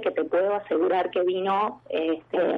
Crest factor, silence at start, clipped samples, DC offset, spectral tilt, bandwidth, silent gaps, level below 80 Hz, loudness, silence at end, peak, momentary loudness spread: 12 dB; 0 s; under 0.1%; under 0.1%; -7.5 dB/octave; 4.9 kHz; none; -72 dBFS; -25 LUFS; 0 s; -12 dBFS; 4 LU